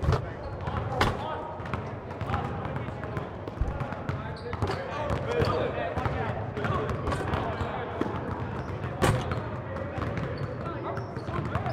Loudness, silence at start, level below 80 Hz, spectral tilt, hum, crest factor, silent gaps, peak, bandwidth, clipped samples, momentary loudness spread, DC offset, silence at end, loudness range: -32 LUFS; 0 s; -42 dBFS; -6.5 dB/octave; none; 20 dB; none; -10 dBFS; 15.5 kHz; under 0.1%; 8 LU; under 0.1%; 0 s; 4 LU